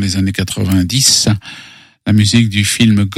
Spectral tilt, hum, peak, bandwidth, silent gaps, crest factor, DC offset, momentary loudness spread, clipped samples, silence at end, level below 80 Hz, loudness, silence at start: -4 dB/octave; none; 0 dBFS; 17 kHz; none; 12 dB; under 0.1%; 13 LU; under 0.1%; 0 s; -42 dBFS; -12 LUFS; 0 s